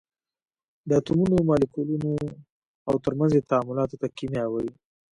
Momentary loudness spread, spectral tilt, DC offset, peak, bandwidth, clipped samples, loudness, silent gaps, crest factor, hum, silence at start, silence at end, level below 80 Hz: 11 LU; -8.5 dB/octave; under 0.1%; -8 dBFS; 11 kHz; under 0.1%; -25 LUFS; 2.50-2.85 s; 18 dB; none; 0.85 s; 0.4 s; -52 dBFS